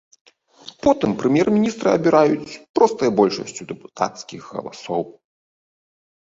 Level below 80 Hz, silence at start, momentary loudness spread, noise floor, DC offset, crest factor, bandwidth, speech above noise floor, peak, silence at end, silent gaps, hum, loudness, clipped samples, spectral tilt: -56 dBFS; 0.65 s; 16 LU; -45 dBFS; under 0.1%; 20 dB; 7.8 kHz; 26 dB; -2 dBFS; 1.1 s; 2.69-2.74 s; none; -19 LUFS; under 0.1%; -6 dB/octave